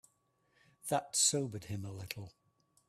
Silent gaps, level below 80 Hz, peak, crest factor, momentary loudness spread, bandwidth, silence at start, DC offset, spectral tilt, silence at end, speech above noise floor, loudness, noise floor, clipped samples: none; -72 dBFS; -16 dBFS; 22 dB; 17 LU; 15.5 kHz; 0.85 s; under 0.1%; -2.5 dB/octave; 0.6 s; 40 dB; -34 LUFS; -76 dBFS; under 0.1%